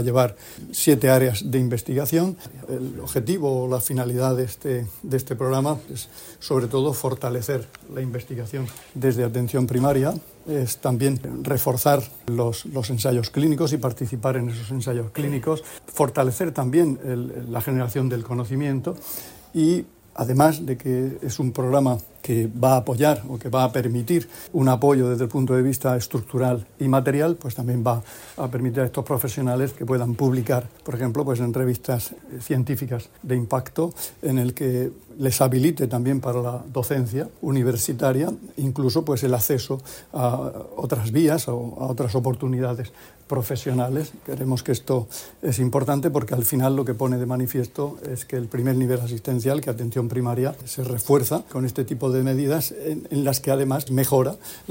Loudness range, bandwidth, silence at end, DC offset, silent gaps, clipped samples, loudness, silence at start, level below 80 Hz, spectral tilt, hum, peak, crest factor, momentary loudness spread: 4 LU; 16.5 kHz; 0.1 s; under 0.1%; none; under 0.1%; -23 LUFS; 0 s; -54 dBFS; -6.5 dB/octave; none; -4 dBFS; 18 dB; 10 LU